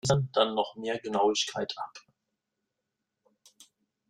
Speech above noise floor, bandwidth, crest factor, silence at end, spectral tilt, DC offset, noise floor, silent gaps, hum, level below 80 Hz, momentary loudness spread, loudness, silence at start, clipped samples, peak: 56 dB; 12 kHz; 24 dB; 2.1 s; -4.5 dB/octave; under 0.1%; -85 dBFS; none; none; -64 dBFS; 11 LU; -29 LUFS; 0.05 s; under 0.1%; -8 dBFS